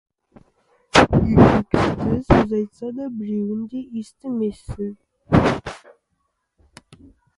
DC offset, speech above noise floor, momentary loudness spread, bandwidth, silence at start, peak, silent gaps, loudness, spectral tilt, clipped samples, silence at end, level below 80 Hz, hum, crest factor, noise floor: under 0.1%; 53 dB; 16 LU; 11.5 kHz; 0.95 s; 0 dBFS; none; -20 LUFS; -6.5 dB/octave; under 0.1%; 1.6 s; -36 dBFS; none; 20 dB; -72 dBFS